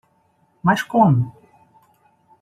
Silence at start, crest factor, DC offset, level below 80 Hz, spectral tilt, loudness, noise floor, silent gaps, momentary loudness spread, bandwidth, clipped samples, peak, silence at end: 0.65 s; 20 dB; under 0.1%; -60 dBFS; -7.5 dB/octave; -18 LUFS; -62 dBFS; none; 8 LU; 14.5 kHz; under 0.1%; -2 dBFS; 1.1 s